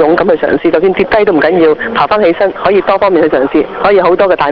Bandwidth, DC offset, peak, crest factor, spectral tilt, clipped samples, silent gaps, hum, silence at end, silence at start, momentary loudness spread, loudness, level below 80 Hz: 5.4 kHz; 0.3%; 0 dBFS; 8 dB; -8 dB/octave; under 0.1%; none; none; 0 s; 0 s; 3 LU; -9 LUFS; -40 dBFS